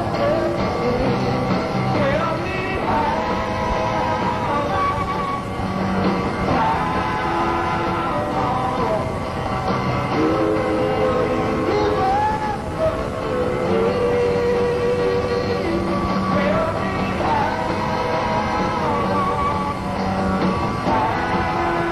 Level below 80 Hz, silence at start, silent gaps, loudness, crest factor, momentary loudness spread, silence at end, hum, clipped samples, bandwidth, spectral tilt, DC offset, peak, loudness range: -36 dBFS; 0 s; none; -20 LUFS; 14 dB; 4 LU; 0 s; none; under 0.1%; 12.5 kHz; -6.5 dB/octave; 0.2%; -6 dBFS; 1 LU